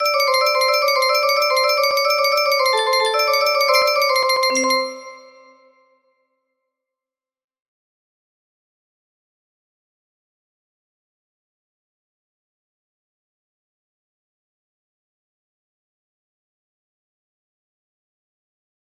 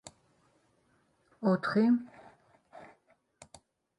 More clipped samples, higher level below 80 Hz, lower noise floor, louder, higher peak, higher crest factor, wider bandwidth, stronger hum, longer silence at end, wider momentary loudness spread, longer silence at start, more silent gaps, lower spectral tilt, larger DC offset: neither; about the same, -74 dBFS vs -76 dBFS; first, -90 dBFS vs -71 dBFS; first, -16 LUFS vs -29 LUFS; first, -4 dBFS vs -16 dBFS; about the same, 20 dB vs 20 dB; first, 15.5 kHz vs 11 kHz; neither; first, 13.8 s vs 1.15 s; second, 2 LU vs 27 LU; second, 0 s vs 1.4 s; neither; second, 1 dB/octave vs -7.5 dB/octave; neither